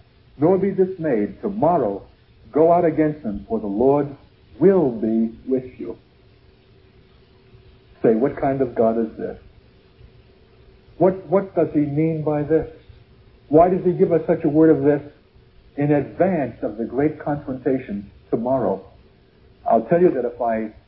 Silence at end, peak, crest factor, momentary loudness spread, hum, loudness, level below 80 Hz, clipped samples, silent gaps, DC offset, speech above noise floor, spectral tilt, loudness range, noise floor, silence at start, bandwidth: 0.15 s; -2 dBFS; 20 dB; 12 LU; none; -20 LUFS; -50 dBFS; under 0.1%; none; under 0.1%; 33 dB; -13.5 dB/octave; 5 LU; -52 dBFS; 0.4 s; 5.2 kHz